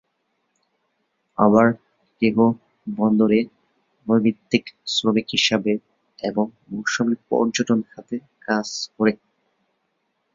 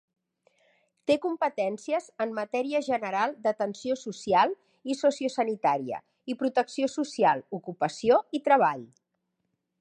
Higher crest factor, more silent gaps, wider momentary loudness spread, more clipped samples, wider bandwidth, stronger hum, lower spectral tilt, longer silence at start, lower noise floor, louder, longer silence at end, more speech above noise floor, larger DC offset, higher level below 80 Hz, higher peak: about the same, 20 dB vs 20 dB; neither; first, 15 LU vs 9 LU; neither; second, 7.6 kHz vs 11 kHz; neither; about the same, -5 dB/octave vs -4.5 dB/octave; first, 1.4 s vs 1.1 s; second, -72 dBFS vs -80 dBFS; first, -21 LUFS vs -28 LUFS; first, 1.2 s vs 0.95 s; about the same, 52 dB vs 53 dB; neither; first, -62 dBFS vs -72 dBFS; first, -2 dBFS vs -8 dBFS